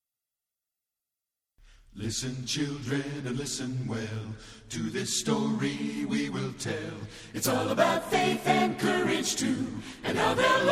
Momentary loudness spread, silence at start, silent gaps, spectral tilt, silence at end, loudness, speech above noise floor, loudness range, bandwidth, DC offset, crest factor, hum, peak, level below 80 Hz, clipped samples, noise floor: 11 LU; 1.95 s; none; -4 dB/octave; 0 s; -29 LUFS; 60 dB; 7 LU; 16 kHz; under 0.1%; 20 dB; none; -10 dBFS; -56 dBFS; under 0.1%; -89 dBFS